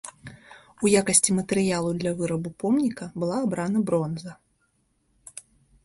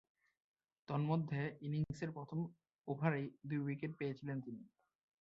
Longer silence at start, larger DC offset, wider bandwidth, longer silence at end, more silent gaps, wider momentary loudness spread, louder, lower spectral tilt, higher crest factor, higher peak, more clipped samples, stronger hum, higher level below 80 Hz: second, 0.05 s vs 0.9 s; neither; first, 12 kHz vs 7.2 kHz; about the same, 0.45 s vs 0.55 s; second, none vs 2.75-2.82 s; first, 24 LU vs 9 LU; first, -24 LUFS vs -42 LUFS; second, -4.5 dB/octave vs -7.5 dB/octave; about the same, 20 dB vs 24 dB; first, -6 dBFS vs -20 dBFS; neither; neither; first, -60 dBFS vs -74 dBFS